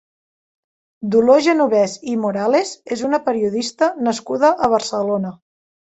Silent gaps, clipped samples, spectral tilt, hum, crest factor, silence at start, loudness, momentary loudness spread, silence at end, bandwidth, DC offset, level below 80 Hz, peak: none; under 0.1%; -5 dB/octave; none; 16 dB; 1 s; -18 LUFS; 9 LU; 0.65 s; 8.2 kHz; under 0.1%; -58 dBFS; -2 dBFS